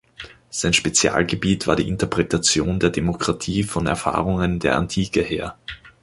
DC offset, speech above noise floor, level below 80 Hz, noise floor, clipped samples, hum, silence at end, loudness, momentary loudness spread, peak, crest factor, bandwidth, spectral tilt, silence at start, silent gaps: under 0.1%; 21 dB; -38 dBFS; -42 dBFS; under 0.1%; none; 0.15 s; -20 LUFS; 11 LU; -2 dBFS; 20 dB; 11.5 kHz; -4 dB/octave; 0.2 s; none